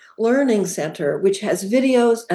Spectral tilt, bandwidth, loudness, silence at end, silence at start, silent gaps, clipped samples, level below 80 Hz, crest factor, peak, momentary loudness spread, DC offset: -5 dB/octave; 12.5 kHz; -19 LUFS; 0 s; 0.2 s; none; under 0.1%; -74 dBFS; 12 dB; -6 dBFS; 7 LU; under 0.1%